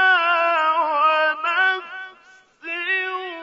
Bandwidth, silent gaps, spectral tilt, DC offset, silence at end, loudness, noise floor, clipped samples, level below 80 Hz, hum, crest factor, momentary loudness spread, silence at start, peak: 7.4 kHz; none; -1 dB/octave; under 0.1%; 0 s; -19 LUFS; -51 dBFS; under 0.1%; -80 dBFS; none; 14 dB; 18 LU; 0 s; -6 dBFS